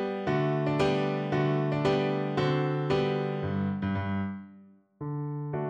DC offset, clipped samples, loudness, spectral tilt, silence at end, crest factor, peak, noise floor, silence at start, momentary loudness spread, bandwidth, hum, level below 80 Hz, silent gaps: under 0.1%; under 0.1%; -29 LUFS; -8 dB/octave; 0 s; 14 dB; -16 dBFS; -55 dBFS; 0 s; 8 LU; 8.4 kHz; none; -58 dBFS; none